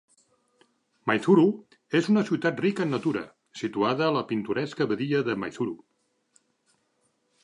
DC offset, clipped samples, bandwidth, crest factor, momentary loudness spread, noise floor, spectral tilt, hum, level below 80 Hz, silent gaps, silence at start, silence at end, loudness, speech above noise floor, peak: under 0.1%; under 0.1%; 11 kHz; 20 dB; 13 LU; -72 dBFS; -6.5 dB/octave; none; -72 dBFS; none; 1.05 s; 1.65 s; -26 LUFS; 47 dB; -8 dBFS